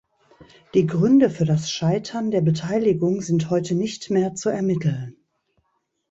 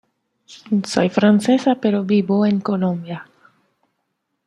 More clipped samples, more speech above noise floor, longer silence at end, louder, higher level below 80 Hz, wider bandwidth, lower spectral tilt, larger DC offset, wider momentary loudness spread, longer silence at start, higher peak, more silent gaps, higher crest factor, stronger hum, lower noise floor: neither; second, 52 dB vs 56 dB; second, 1 s vs 1.25 s; second, -21 LUFS vs -18 LUFS; about the same, -58 dBFS vs -62 dBFS; second, 8 kHz vs 11 kHz; about the same, -6.5 dB/octave vs -6.5 dB/octave; neither; about the same, 7 LU vs 9 LU; about the same, 0.4 s vs 0.5 s; second, -6 dBFS vs -2 dBFS; neither; about the same, 16 dB vs 18 dB; neither; about the same, -72 dBFS vs -74 dBFS